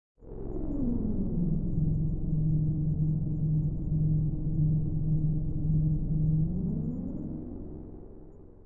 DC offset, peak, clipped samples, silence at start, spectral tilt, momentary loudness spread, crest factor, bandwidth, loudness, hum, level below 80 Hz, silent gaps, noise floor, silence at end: 0.3%; -16 dBFS; under 0.1%; 0.15 s; -15.5 dB/octave; 13 LU; 12 dB; 1.3 kHz; -30 LUFS; none; -36 dBFS; none; -49 dBFS; 0 s